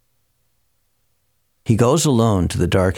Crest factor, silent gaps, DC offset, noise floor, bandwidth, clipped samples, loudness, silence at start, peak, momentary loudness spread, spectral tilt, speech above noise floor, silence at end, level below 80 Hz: 16 dB; none; under 0.1%; -68 dBFS; 17 kHz; under 0.1%; -17 LUFS; 1.65 s; -4 dBFS; 6 LU; -6 dB/octave; 52 dB; 0 s; -40 dBFS